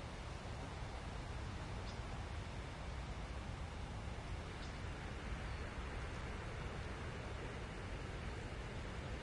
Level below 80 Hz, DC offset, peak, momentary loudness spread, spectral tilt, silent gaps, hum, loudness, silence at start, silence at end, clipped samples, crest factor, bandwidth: -50 dBFS; under 0.1%; -34 dBFS; 1 LU; -5.5 dB/octave; none; none; -48 LUFS; 0 s; 0 s; under 0.1%; 12 dB; 11.5 kHz